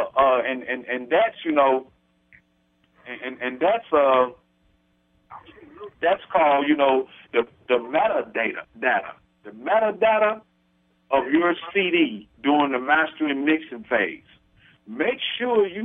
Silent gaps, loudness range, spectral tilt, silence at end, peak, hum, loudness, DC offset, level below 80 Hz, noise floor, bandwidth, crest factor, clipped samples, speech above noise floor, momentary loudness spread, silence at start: none; 3 LU; -7 dB/octave; 0 s; -6 dBFS; none; -22 LUFS; under 0.1%; -62 dBFS; -65 dBFS; 3.9 kHz; 18 dB; under 0.1%; 43 dB; 9 LU; 0 s